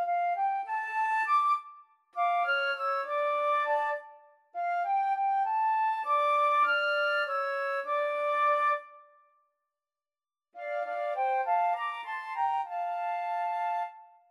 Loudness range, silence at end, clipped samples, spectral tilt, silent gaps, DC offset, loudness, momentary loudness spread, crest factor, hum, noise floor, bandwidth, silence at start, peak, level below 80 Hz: 5 LU; 0.25 s; under 0.1%; 1.5 dB/octave; none; under 0.1%; -29 LUFS; 9 LU; 12 dB; none; under -90 dBFS; 12.5 kHz; 0 s; -18 dBFS; under -90 dBFS